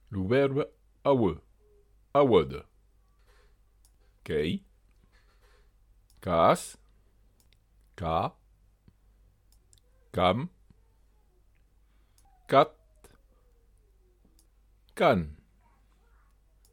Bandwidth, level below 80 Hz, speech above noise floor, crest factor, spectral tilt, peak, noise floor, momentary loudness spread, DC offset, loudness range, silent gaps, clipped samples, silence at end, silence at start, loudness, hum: 16.5 kHz; -56 dBFS; 38 dB; 26 dB; -6.5 dB/octave; -6 dBFS; -63 dBFS; 18 LU; under 0.1%; 9 LU; none; under 0.1%; 1.4 s; 0.1 s; -27 LUFS; none